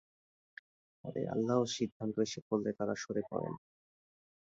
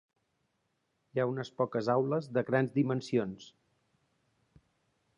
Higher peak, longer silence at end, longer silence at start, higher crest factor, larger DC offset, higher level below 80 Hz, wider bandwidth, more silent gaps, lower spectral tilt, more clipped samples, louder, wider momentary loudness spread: second, -18 dBFS vs -14 dBFS; second, 0.85 s vs 1.7 s; about the same, 1.05 s vs 1.15 s; about the same, 20 dB vs 20 dB; neither; about the same, -74 dBFS vs -74 dBFS; second, 7.6 kHz vs 10.5 kHz; first, 1.92-2.00 s, 2.42-2.51 s vs none; second, -5.5 dB/octave vs -7.5 dB/octave; neither; second, -36 LUFS vs -32 LUFS; first, 22 LU vs 7 LU